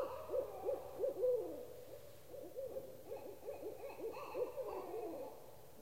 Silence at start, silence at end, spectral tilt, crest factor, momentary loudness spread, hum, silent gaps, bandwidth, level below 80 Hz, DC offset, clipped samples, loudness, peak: 0 s; 0 s; -5.5 dB/octave; 16 dB; 16 LU; none; none; 16 kHz; -72 dBFS; 0.1%; under 0.1%; -45 LUFS; -28 dBFS